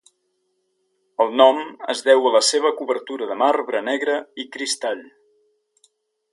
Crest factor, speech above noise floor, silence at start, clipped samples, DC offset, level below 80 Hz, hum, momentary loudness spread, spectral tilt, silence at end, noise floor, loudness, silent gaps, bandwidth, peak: 22 dB; 51 dB; 1.2 s; under 0.1%; under 0.1%; -76 dBFS; none; 13 LU; -0.5 dB/octave; 1.3 s; -71 dBFS; -19 LUFS; none; 11.5 kHz; 0 dBFS